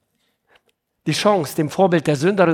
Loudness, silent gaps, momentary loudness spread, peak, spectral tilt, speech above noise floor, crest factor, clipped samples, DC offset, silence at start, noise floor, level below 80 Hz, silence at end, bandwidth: -18 LUFS; none; 7 LU; -2 dBFS; -5.5 dB/octave; 51 dB; 18 dB; under 0.1%; under 0.1%; 1.05 s; -68 dBFS; -62 dBFS; 0 s; 18 kHz